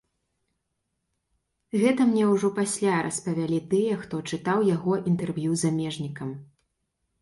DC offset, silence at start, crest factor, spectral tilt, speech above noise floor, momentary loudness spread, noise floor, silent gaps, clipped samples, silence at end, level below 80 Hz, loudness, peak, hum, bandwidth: under 0.1%; 1.75 s; 18 dB; -6 dB/octave; 54 dB; 11 LU; -79 dBFS; none; under 0.1%; 0.75 s; -64 dBFS; -25 LUFS; -8 dBFS; none; 11.5 kHz